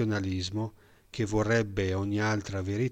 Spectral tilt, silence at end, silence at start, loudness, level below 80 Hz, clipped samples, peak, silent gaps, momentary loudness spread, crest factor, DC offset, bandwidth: -6 dB/octave; 0 s; 0 s; -30 LUFS; -52 dBFS; under 0.1%; -16 dBFS; none; 9 LU; 14 dB; under 0.1%; 9 kHz